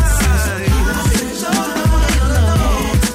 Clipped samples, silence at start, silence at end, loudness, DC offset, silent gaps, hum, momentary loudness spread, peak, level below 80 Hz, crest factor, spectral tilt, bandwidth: under 0.1%; 0 s; 0 s; -15 LUFS; under 0.1%; none; none; 3 LU; -4 dBFS; -16 dBFS; 10 dB; -4.5 dB/octave; 16 kHz